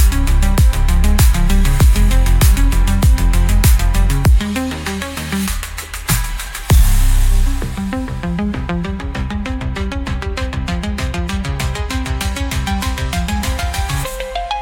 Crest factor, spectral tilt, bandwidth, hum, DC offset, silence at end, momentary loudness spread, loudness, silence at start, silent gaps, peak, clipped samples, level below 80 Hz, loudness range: 14 dB; -5 dB/octave; 17 kHz; none; under 0.1%; 0 s; 9 LU; -17 LUFS; 0 s; none; 0 dBFS; under 0.1%; -14 dBFS; 7 LU